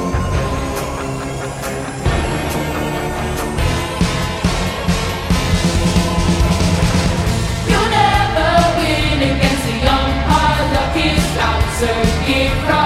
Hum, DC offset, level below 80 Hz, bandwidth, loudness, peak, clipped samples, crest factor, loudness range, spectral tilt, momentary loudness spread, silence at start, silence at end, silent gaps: none; under 0.1%; -24 dBFS; 16 kHz; -16 LUFS; 0 dBFS; under 0.1%; 16 dB; 6 LU; -5 dB/octave; 7 LU; 0 s; 0 s; none